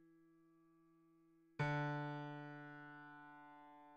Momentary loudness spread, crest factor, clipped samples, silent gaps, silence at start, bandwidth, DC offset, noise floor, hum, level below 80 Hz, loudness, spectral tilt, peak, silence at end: 19 LU; 20 dB; under 0.1%; none; 0 s; 8 kHz; under 0.1%; -72 dBFS; none; -78 dBFS; -46 LUFS; -7.5 dB/octave; -30 dBFS; 0 s